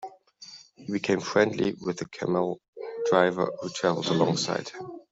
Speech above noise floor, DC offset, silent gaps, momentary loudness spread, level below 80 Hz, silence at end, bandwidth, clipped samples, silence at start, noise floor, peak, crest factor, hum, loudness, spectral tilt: 23 dB; under 0.1%; 2.68-2.73 s; 20 LU; -68 dBFS; 0.1 s; 8 kHz; under 0.1%; 0 s; -49 dBFS; -6 dBFS; 22 dB; none; -27 LUFS; -5 dB/octave